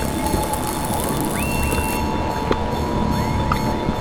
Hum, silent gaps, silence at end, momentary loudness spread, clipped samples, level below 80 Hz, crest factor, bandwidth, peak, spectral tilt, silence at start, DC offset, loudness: none; none; 0 s; 2 LU; under 0.1%; -30 dBFS; 18 dB; over 20 kHz; -2 dBFS; -5 dB/octave; 0 s; under 0.1%; -21 LUFS